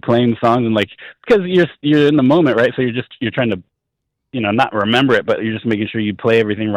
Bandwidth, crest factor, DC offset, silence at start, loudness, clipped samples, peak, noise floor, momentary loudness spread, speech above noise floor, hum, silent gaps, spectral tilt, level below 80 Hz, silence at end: 10.5 kHz; 12 dB; under 0.1%; 0.05 s; -15 LUFS; under 0.1%; -4 dBFS; -76 dBFS; 9 LU; 61 dB; none; none; -7.5 dB/octave; -54 dBFS; 0 s